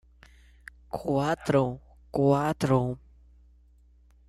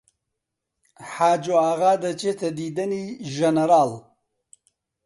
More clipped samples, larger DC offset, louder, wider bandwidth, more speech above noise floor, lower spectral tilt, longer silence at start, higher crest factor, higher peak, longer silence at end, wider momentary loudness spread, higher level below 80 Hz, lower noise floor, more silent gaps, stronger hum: neither; neither; second, -27 LUFS vs -22 LUFS; first, 13 kHz vs 11.5 kHz; second, 33 dB vs 60 dB; first, -7.5 dB/octave vs -5.5 dB/octave; about the same, 0.95 s vs 1 s; about the same, 18 dB vs 18 dB; second, -12 dBFS vs -6 dBFS; first, 1.3 s vs 1.05 s; about the same, 14 LU vs 13 LU; first, -54 dBFS vs -70 dBFS; second, -58 dBFS vs -82 dBFS; neither; first, 60 Hz at -50 dBFS vs none